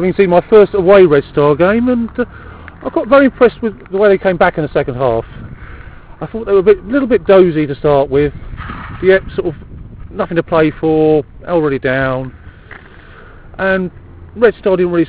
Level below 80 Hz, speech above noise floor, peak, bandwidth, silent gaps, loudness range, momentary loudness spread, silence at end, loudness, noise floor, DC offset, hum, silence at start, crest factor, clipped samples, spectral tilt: -36 dBFS; 25 dB; 0 dBFS; 4 kHz; none; 5 LU; 18 LU; 0 s; -12 LUFS; -36 dBFS; under 0.1%; none; 0 s; 12 dB; 0.4%; -11 dB/octave